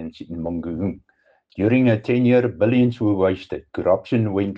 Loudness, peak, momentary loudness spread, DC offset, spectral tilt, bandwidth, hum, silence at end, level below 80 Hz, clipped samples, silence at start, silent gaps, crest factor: -20 LUFS; -6 dBFS; 13 LU; under 0.1%; -9.5 dB/octave; 5.6 kHz; none; 0 s; -52 dBFS; under 0.1%; 0 s; none; 14 dB